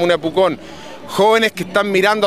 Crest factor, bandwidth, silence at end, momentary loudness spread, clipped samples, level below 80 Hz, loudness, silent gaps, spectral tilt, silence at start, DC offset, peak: 16 dB; 15.5 kHz; 0 s; 17 LU; under 0.1%; -52 dBFS; -16 LUFS; none; -4.5 dB/octave; 0 s; 0.5%; 0 dBFS